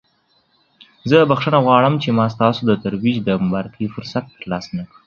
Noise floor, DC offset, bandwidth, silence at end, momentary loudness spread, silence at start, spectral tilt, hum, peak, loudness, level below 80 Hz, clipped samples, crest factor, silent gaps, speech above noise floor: -61 dBFS; under 0.1%; 7 kHz; 0.2 s; 13 LU; 1.05 s; -7.5 dB/octave; none; 0 dBFS; -17 LUFS; -52 dBFS; under 0.1%; 18 dB; none; 44 dB